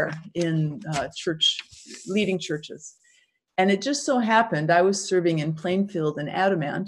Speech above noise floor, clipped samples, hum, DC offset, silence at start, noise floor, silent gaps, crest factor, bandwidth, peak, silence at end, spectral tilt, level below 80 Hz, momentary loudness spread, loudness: 39 dB; under 0.1%; none; under 0.1%; 0 s; -63 dBFS; none; 18 dB; 11.5 kHz; -6 dBFS; 0 s; -4.5 dB/octave; -64 dBFS; 12 LU; -24 LUFS